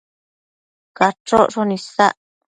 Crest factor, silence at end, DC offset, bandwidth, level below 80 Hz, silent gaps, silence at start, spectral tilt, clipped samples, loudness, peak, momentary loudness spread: 20 dB; 0.45 s; under 0.1%; 11 kHz; -54 dBFS; 1.20-1.25 s; 1 s; -5 dB/octave; under 0.1%; -17 LUFS; 0 dBFS; 6 LU